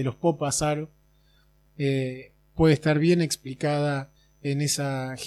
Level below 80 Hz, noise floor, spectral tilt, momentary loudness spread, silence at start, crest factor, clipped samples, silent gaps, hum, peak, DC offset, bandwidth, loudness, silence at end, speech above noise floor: -50 dBFS; -61 dBFS; -5.5 dB/octave; 14 LU; 0 s; 18 dB; under 0.1%; none; none; -8 dBFS; under 0.1%; 14.5 kHz; -25 LUFS; 0 s; 36 dB